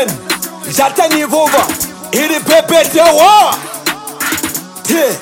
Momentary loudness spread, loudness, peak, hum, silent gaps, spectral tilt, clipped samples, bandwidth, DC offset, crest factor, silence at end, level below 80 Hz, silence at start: 11 LU; -11 LUFS; 0 dBFS; none; none; -2.5 dB/octave; under 0.1%; 17 kHz; under 0.1%; 12 dB; 0 s; -50 dBFS; 0 s